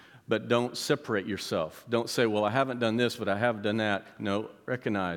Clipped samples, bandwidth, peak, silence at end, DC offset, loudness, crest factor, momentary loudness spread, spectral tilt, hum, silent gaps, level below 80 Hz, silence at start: under 0.1%; 18.5 kHz; -10 dBFS; 0 s; under 0.1%; -29 LUFS; 20 dB; 6 LU; -5 dB/octave; none; none; -74 dBFS; 0.15 s